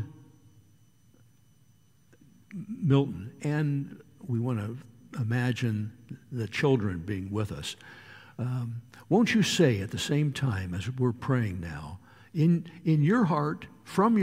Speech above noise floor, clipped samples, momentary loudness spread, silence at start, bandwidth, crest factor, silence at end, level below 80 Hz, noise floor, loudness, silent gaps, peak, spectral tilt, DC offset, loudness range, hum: 35 dB; under 0.1%; 19 LU; 0 s; 15.5 kHz; 20 dB; 0 s; -60 dBFS; -63 dBFS; -29 LUFS; none; -10 dBFS; -6.5 dB/octave; under 0.1%; 5 LU; none